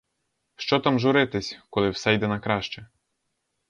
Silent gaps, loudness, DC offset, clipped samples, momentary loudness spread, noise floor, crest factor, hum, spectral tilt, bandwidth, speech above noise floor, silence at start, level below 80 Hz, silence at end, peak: none; -24 LUFS; under 0.1%; under 0.1%; 12 LU; -77 dBFS; 20 dB; none; -5.5 dB/octave; 9.6 kHz; 53 dB; 0.6 s; -56 dBFS; 0.85 s; -6 dBFS